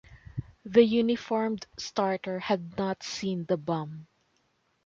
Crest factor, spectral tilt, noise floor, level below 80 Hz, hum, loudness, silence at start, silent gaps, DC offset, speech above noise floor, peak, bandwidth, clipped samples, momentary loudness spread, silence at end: 22 dB; -5.5 dB/octave; -72 dBFS; -60 dBFS; none; -28 LUFS; 0.1 s; none; under 0.1%; 44 dB; -8 dBFS; 7.6 kHz; under 0.1%; 18 LU; 0.8 s